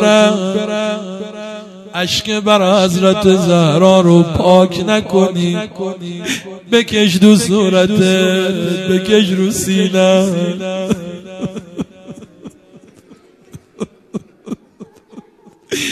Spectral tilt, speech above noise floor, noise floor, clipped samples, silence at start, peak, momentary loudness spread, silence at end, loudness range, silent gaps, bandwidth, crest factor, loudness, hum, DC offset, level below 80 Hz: -5.5 dB/octave; 34 dB; -46 dBFS; under 0.1%; 0 s; 0 dBFS; 19 LU; 0 s; 19 LU; none; 14 kHz; 14 dB; -13 LUFS; none; under 0.1%; -44 dBFS